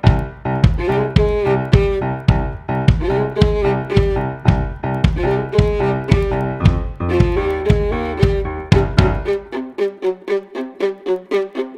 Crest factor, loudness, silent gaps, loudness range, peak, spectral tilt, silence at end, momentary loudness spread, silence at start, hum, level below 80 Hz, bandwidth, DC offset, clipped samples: 16 dB; -18 LUFS; none; 2 LU; 0 dBFS; -8 dB/octave; 0 s; 7 LU; 0.05 s; none; -24 dBFS; 9.8 kHz; under 0.1%; under 0.1%